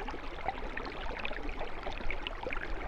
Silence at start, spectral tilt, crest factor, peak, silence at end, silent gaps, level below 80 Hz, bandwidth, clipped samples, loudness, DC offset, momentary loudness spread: 0 s; -5 dB/octave; 18 dB; -18 dBFS; 0 s; none; -40 dBFS; 7.2 kHz; under 0.1%; -40 LUFS; under 0.1%; 3 LU